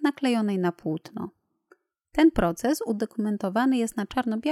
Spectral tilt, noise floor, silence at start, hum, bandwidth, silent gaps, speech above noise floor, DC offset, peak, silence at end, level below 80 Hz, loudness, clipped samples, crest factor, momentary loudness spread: -6 dB/octave; -63 dBFS; 0 s; none; 15 kHz; none; 38 dB; under 0.1%; -8 dBFS; 0 s; -48 dBFS; -26 LUFS; under 0.1%; 18 dB; 11 LU